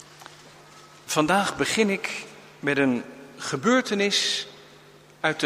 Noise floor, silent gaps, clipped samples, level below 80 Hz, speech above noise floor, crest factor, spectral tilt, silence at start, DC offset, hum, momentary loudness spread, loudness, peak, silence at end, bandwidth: -51 dBFS; none; under 0.1%; -64 dBFS; 27 dB; 20 dB; -3.5 dB/octave; 0 s; under 0.1%; none; 21 LU; -24 LUFS; -6 dBFS; 0 s; 15.5 kHz